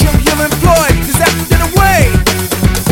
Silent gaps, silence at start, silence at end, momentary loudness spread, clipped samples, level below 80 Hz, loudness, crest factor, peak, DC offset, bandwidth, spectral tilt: none; 0 s; 0 s; 4 LU; under 0.1%; -16 dBFS; -10 LUFS; 10 dB; 0 dBFS; under 0.1%; 17.5 kHz; -4.5 dB/octave